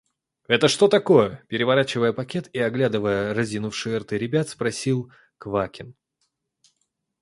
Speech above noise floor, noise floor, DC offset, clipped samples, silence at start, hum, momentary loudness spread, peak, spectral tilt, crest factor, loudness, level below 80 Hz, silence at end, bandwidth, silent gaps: 53 dB; -75 dBFS; under 0.1%; under 0.1%; 0.5 s; none; 11 LU; -2 dBFS; -5 dB/octave; 22 dB; -22 LUFS; -58 dBFS; 1.3 s; 11.5 kHz; none